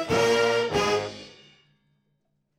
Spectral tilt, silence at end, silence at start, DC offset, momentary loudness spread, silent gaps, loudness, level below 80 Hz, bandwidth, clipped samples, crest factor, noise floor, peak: -3.5 dB/octave; 1.3 s; 0 s; under 0.1%; 15 LU; none; -23 LUFS; -54 dBFS; 15 kHz; under 0.1%; 18 dB; -74 dBFS; -10 dBFS